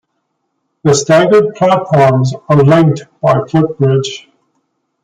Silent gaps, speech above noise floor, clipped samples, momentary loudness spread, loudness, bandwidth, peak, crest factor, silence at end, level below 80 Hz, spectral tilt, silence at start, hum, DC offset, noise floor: none; 57 dB; under 0.1%; 8 LU; -11 LUFS; 9.4 kHz; 0 dBFS; 12 dB; 0.85 s; -48 dBFS; -6 dB/octave; 0.85 s; none; under 0.1%; -67 dBFS